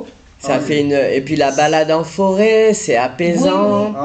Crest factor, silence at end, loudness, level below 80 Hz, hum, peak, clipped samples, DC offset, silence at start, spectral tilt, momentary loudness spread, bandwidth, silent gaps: 12 dB; 0 s; -14 LUFS; -50 dBFS; none; -2 dBFS; under 0.1%; under 0.1%; 0 s; -5 dB/octave; 5 LU; 9.2 kHz; none